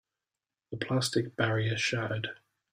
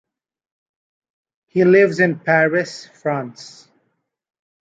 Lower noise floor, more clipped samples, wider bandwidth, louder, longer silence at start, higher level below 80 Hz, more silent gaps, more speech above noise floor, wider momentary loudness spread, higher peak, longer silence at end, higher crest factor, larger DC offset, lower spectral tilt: first, under -90 dBFS vs -71 dBFS; neither; first, 15.5 kHz vs 8 kHz; second, -31 LUFS vs -17 LUFS; second, 0.7 s vs 1.55 s; about the same, -66 dBFS vs -68 dBFS; neither; first, over 59 dB vs 54 dB; about the same, 12 LU vs 14 LU; second, -12 dBFS vs -2 dBFS; second, 0.4 s vs 1.25 s; about the same, 20 dB vs 18 dB; neither; second, -4.5 dB/octave vs -6.5 dB/octave